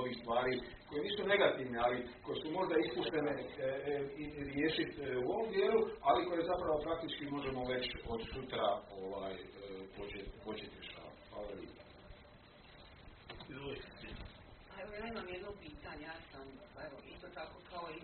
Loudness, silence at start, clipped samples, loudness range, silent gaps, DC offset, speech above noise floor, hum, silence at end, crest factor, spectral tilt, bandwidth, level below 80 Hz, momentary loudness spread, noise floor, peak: -39 LUFS; 0 s; under 0.1%; 15 LU; none; under 0.1%; 21 dB; none; 0 s; 22 dB; -3 dB/octave; 4.5 kHz; -60 dBFS; 20 LU; -60 dBFS; -16 dBFS